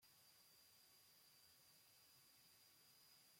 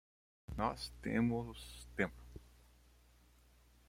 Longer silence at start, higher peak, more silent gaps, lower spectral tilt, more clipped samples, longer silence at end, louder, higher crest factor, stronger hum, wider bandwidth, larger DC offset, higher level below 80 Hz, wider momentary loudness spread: second, 0 s vs 0.5 s; second, -58 dBFS vs -18 dBFS; neither; second, -0.5 dB/octave vs -6 dB/octave; neither; second, 0 s vs 1.4 s; second, -69 LUFS vs -40 LUFS; second, 14 dB vs 24 dB; second, none vs 60 Hz at -55 dBFS; about the same, 16.5 kHz vs 16 kHz; neither; second, under -90 dBFS vs -58 dBFS; second, 1 LU vs 22 LU